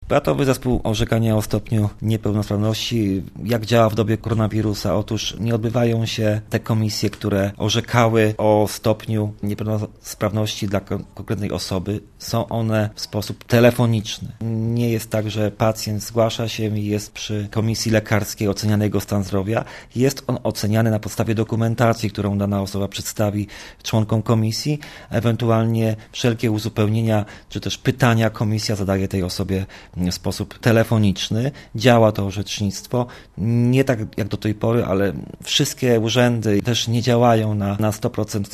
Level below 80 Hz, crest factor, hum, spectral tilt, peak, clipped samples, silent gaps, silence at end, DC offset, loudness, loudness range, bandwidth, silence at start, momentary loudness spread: -44 dBFS; 20 dB; none; -6 dB/octave; 0 dBFS; under 0.1%; none; 0 s; under 0.1%; -20 LUFS; 3 LU; 14 kHz; 0 s; 8 LU